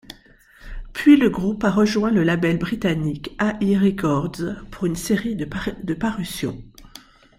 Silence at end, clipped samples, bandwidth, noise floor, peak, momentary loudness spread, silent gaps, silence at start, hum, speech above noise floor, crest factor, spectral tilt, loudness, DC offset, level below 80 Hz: 0.4 s; under 0.1%; 15.5 kHz; -51 dBFS; -2 dBFS; 13 LU; none; 0.1 s; none; 31 dB; 18 dB; -6.5 dB/octave; -21 LUFS; under 0.1%; -42 dBFS